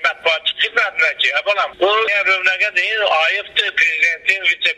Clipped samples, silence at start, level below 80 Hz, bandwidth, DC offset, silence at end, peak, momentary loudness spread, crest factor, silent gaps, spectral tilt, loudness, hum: under 0.1%; 0 s; -62 dBFS; 13 kHz; under 0.1%; 0.05 s; 0 dBFS; 3 LU; 16 dB; none; 0 dB/octave; -15 LUFS; none